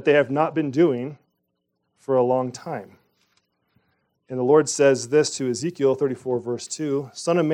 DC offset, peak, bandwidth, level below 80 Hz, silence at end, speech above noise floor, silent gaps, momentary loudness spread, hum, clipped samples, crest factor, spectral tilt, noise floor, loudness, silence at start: under 0.1%; -4 dBFS; 11.5 kHz; -74 dBFS; 0 s; 54 dB; none; 14 LU; none; under 0.1%; 18 dB; -5 dB/octave; -75 dBFS; -22 LUFS; 0 s